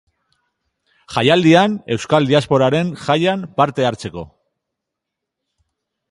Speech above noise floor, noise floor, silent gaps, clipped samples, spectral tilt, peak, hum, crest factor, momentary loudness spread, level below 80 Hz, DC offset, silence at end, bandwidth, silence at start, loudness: 65 dB; -80 dBFS; none; under 0.1%; -6 dB/octave; 0 dBFS; none; 18 dB; 12 LU; -52 dBFS; under 0.1%; 1.85 s; 11.5 kHz; 1.1 s; -16 LUFS